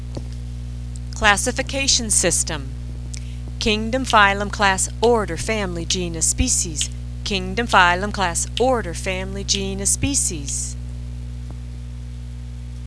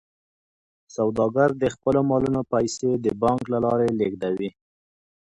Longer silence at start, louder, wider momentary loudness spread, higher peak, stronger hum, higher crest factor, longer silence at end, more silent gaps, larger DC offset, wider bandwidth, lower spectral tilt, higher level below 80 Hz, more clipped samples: second, 0 s vs 0.95 s; first, -19 LUFS vs -23 LUFS; first, 17 LU vs 6 LU; first, 0 dBFS vs -6 dBFS; first, 60 Hz at -30 dBFS vs none; about the same, 22 dB vs 18 dB; second, 0 s vs 0.8 s; neither; neither; about the same, 11 kHz vs 11 kHz; second, -2.5 dB/octave vs -6.5 dB/octave; first, -30 dBFS vs -54 dBFS; neither